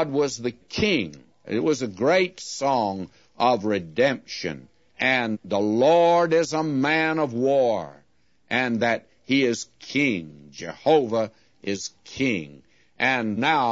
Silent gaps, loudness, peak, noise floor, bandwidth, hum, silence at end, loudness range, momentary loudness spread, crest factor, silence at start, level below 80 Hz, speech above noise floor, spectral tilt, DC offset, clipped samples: none; -23 LUFS; -6 dBFS; -65 dBFS; 8 kHz; none; 0 s; 4 LU; 12 LU; 16 dB; 0 s; -60 dBFS; 42 dB; -4.5 dB/octave; under 0.1%; under 0.1%